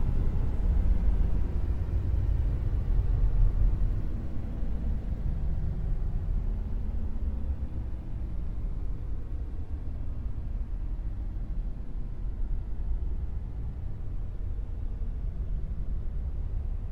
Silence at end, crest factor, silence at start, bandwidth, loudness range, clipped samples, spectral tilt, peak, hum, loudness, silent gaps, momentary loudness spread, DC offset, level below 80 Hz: 0 s; 16 dB; 0 s; 3.2 kHz; 7 LU; under 0.1%; -10 dB/octave; -12 dBFS; none; -34 LUFS; none; 9 LU; under 0.1%; -30 dBFS